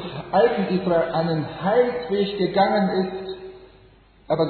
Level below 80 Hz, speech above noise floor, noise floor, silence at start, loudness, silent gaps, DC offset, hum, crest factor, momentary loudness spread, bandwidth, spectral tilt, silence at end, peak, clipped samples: -54 dBFS; 31 dB; -52 dBFS; 0 s; -22 LUFS; none; under 0.1%; none; 16 dB; 11 LU; 4.6 kHz; -10 dB/octave; 0 s; -6 dBFS; under 0.1%